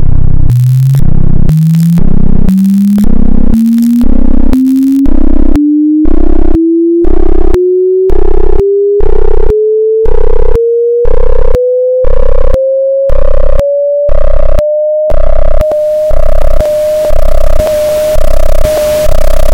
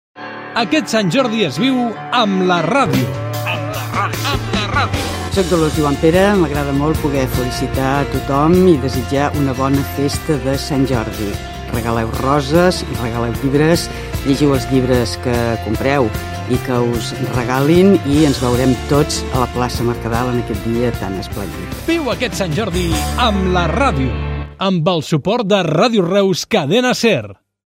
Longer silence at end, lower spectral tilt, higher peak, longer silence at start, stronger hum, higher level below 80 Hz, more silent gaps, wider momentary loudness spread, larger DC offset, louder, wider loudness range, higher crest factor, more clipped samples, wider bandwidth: second, 0 s vs 0.35 s; first, -8.5 dB/octave vs -5.5 dB/octave; about the same, 0 dBFS vs 0 dBFS; second, 0 s vs 0.15 s; neither; first, -8 dBFS vs -30 dBFS; neither; about the same, 5 LU vs 7 LU; neither; first, -9 LUFS vs -16 LUFS; about the same, 2 LU vs 3 LU; second, 2 dB vs 16 dB; first, 20% vs under 0.1%; second, 7 kHz vs 16.5 kHz